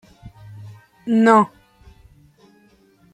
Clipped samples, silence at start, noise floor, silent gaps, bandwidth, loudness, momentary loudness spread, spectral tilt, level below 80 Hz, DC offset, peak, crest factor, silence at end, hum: under 0.1%; 0.25 s; -55 dBFS; none; 9.2 kHz; -16 LUFS; 27 LU; -6.5 dB/octave; -56 dBFS; under 0.1%; -2 dBFS; 20 dB; 1.65 s; none